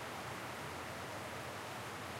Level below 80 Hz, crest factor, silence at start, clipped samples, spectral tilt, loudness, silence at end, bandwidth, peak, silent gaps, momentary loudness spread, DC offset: -68 dBFS; 12 dB; 0 s; under 0.1%; -3.5 dB/octave; -45 LUFS; 0 s; 16 kHz; -32 dBFS; none; 0 LU; under 0.1%